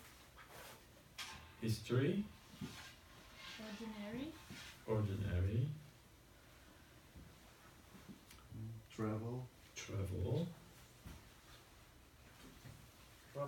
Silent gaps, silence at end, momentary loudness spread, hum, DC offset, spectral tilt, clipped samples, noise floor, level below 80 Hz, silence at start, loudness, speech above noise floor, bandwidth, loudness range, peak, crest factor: none; 0 s; 22 LU; none; under 0.1%; -6.5 dB/octave; under 0.1%; -64 dBFS; -64 dBFS; 0 s; -44 LUFS; 23 dB; 17.5 kHz; 6 LU; -26 dBFS; 20 dB